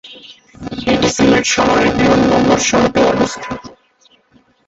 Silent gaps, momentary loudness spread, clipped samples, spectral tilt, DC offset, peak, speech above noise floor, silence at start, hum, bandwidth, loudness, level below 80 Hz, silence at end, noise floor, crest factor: none; 16 LU; under 0.1%; -4 dB/octave; under 0.1%; 0 dBFS; 40 dB; 0.05 s; none; 8.2 kHz; -13 LUFS; -38 dBFS; 0.95 s; -53 dBFS; 14 dB